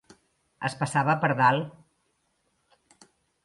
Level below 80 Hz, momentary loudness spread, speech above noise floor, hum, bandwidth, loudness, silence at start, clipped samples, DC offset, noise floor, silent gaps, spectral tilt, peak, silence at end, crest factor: -70 dBFS; 12 LU; 49 dB; none; 11.5 kHz; -25 LUFS; 0.6 s; under 0.1%; under 0.1%; -73 dBFS; none; -5.5 dB/octave; -8 dBFS; 1.75 s; 20 dB